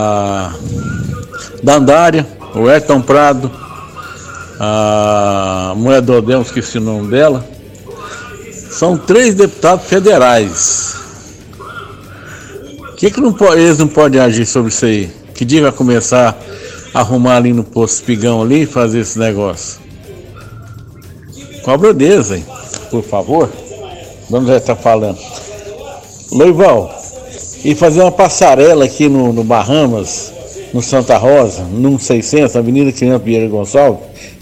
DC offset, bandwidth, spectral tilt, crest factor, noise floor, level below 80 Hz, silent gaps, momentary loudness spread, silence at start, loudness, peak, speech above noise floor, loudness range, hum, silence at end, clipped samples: under 0.1%; 15.5 kHz; -5 dB/octave; 12 dB; -33 dBFS; -40 dBFS; none; 21 LU; 0 s; -10 LUFS; 0 dBFS; 23 dB; 5 LU; none; 0.05 s; 0.6%